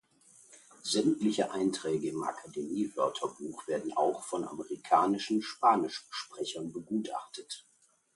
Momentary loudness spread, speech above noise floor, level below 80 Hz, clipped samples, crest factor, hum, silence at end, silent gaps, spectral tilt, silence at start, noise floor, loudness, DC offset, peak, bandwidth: 14 LU; 29 dB; -76 dBFS; under 0.1%; 22 dB; none; 0.55 s; none; -4.5 dB/octave; 0.5 s; -61 dBFS; -32 LUFS; under 0.1%; -12 dBFS; 11.5 kHz